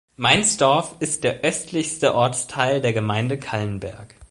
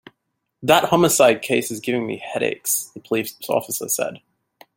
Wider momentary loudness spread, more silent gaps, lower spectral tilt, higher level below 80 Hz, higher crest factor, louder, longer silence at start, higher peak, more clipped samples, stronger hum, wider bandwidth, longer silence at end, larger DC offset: about the same, 10 LU vs 10 LU; neither; about the same, -3.5 dB/octave vs -3.5 dB/octave; first, -52 dBFS vs -60 dBFS; about the same, 20 dB vs 20 dB; about the same, -21 LUFS vs -20 LUFS; second, 0.2 s vs 0.6 s; about the same, -2 dBFS vs 0 dBFS; neither; neither; second, 11.5 kHz vs 17 kHz; second, 0.05 s vs 0.6 s; neither